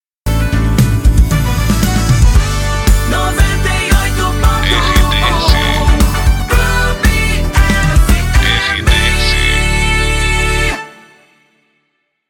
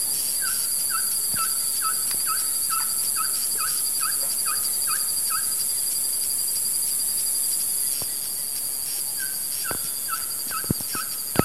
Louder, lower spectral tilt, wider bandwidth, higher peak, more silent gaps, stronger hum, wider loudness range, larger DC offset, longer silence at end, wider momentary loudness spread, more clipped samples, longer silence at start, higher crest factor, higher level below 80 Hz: first, -12 LUFS vs -22 LUFS; first, -4.5 dB/octave vs -0.5 dB/octave; about the same, 17.5 kHz vs 16 kHz; about the same, 0 dBFS vs -2 dBFS; neither; neither; about the same, 1 LU vs 3 LU; second, under 0.1% vs 0.7%; first, 1.4 s vs 0 s; about the same, 3 LU vs 4 LU; neither; first, 0.25 s vs 0 s; second, 12 dB vs 24 dB; first, -14 dBFS vs -56 dBFS